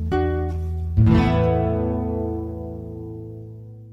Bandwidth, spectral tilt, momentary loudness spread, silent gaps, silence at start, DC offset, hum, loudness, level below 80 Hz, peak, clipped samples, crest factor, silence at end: 6 kHz; -9.5 dB/octave; 19 LU; none; 0 s; under 0.1%; none; -22 LUFS; -32 dBFS; -4 dBFS; under 0.1%; 16 dB; 0 s